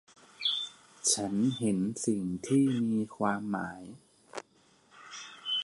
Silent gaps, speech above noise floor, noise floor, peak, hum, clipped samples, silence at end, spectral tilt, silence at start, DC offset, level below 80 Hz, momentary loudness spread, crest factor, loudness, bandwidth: none; 35 dB; -65 dBFS; -14 dBFS; none; under 0.1%; 0 s; -4 dB/octave; 0.4 s; under 0.1%; -68 dBFS; 18 LU; 18 dB; -31 LUFS; 11.5 kHz